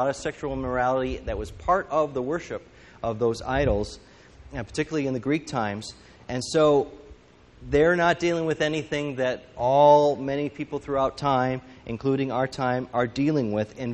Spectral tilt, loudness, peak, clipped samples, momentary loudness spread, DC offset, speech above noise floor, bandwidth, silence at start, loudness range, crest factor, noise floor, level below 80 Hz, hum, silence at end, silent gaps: -6 dB/octave; -25 LUFS; -6 dBFS; under 0.1%; 13 LU; under 0.1%; 27 dB; 10.5 kHz; 0 s; 6 LU; 20 dB; -52 dBFS; -44 dBFS; none; 0 s; none